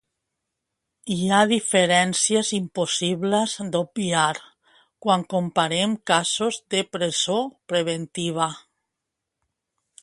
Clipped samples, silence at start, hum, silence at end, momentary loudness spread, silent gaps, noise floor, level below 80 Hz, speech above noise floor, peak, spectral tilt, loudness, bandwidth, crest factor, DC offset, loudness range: under 0.1%; 1.05 s; none; 1.45 s; 9 LU; none; -83 dBFS; -66 dBFS; 60 dB; -2 dBFS; -3.5 dB/octave; -22 LUFS; 11.5 kHz; 22 dB; under 0.1%; 4 LU